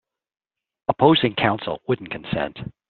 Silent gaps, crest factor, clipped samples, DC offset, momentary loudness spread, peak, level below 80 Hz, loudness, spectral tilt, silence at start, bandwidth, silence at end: none; 22 dB; under 0.1%; under 0.1%; 12 LU; -2 dBFS; -54 dBFS; -22 LUFS; -4 dB/octave; 0.9 s; 4.5 kHz; 0.2 s